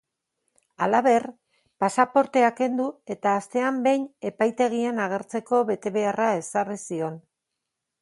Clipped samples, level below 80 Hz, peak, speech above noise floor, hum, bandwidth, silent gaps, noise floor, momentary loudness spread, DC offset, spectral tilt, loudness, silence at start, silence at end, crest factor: under 0.1%; -74 dBFS; -4 dBFS; 59 dB; none; 11.5 kHz; none; -83 dBFS; 10 LU; under 0.1%; -5 dB/octave; -24 LUFS; 0.8 s; 0.8 s; 20 dB